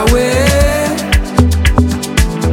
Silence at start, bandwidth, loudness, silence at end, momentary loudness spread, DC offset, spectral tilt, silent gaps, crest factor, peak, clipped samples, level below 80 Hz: 0 s; 17.5 kHz; -12 LUFS; 0 s; 4 LU; under 0.1%; -5 dB/octave; none; 10 dB; 0 dBFS; under 0.1%; -16 dBFS